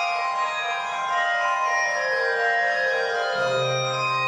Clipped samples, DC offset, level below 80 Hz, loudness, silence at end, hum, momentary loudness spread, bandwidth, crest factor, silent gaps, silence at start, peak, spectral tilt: under 0.1%; under 0.1%; -78 dBFS; -23 LUFS; 0 s; none; 4 LU; 11.5 kHz; 12 dB; none; 0 s; -10 dBFS; -2.5 dB/octave